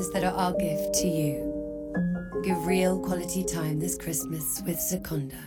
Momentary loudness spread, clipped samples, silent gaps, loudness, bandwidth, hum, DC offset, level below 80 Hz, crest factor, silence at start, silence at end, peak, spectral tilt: 6 LU; under 0.1%; none; -28 LUFS; 19.5 kHz; none; under 0.1%; -48 dBFS; 16 dB; 0 s; 0 s; -12 dBFS; -5 dB/octave